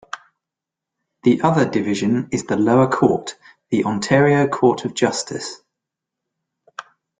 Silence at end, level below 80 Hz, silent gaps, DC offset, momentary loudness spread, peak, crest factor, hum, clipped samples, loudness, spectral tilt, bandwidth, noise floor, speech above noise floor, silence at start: 0.4 s; -56 dBFS; none; under 0.1%; 20 LU; 0 dBFS; 20 dB; none; under 0.1%; -18 LUFS; -6 dB/octave; 9.6 kHz; -85 dBFS; 68 dB; 0.15 s